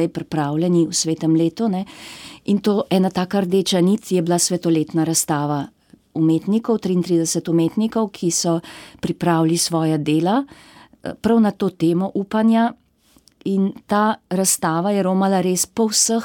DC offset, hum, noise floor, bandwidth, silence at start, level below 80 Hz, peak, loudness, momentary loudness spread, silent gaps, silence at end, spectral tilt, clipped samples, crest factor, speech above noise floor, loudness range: under 0.1%; none; -56 dBFS; 17.5 kHz; 0 s; -58 dBFS; -4 dBFS; -19 LUFS; 8 LU; none; 0 s; -5 dB/octave; under 0.1%; 14 dB; 37 dB; 2 LU